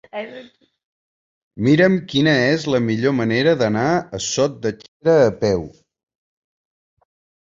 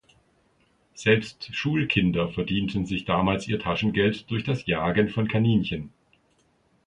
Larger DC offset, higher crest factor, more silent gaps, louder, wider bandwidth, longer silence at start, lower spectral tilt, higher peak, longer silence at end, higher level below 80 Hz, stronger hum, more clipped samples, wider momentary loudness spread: neither; about the same, 18 dB vs 20 dB; first, 0.85-1.51 s, 4.88-5.00 s vs none; first, -18 LUFS vs -25 LUFS; second, 7.8 kHz vs 10.5 kHz; second, 0.15 s vs 0.95 s; about the same, -5.5 dB/octave vs -6.5 dB/octave; first, -2 dBFS vs -6 dBFS; first, 1.8 s vs 1 s; about the same, -52 dBFS vs -48 dBFS; neither; neither; first, 12 LU vs 7 LU